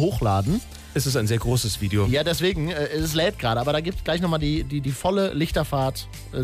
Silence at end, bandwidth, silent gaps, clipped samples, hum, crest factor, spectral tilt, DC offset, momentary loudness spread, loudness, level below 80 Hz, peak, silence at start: 0 s; 15.5 kHz; none; under 0.1%; none; 12 dB; -5.5 dB/octave; under 0.1%; 5 LU; -24 LUFS; -36 dBFS; -10 dBFS; 0 s